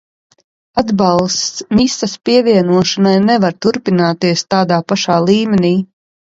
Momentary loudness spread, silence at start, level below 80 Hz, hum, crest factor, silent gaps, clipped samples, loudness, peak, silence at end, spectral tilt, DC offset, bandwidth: 6 LU; 0.75 s; -46 dBFS; none; 14 dB; none; under 0.1%; -13 LUFS; 0 dBFS; 0.45 s; -5 dB/octave; under 0.1%; 7.8 kHz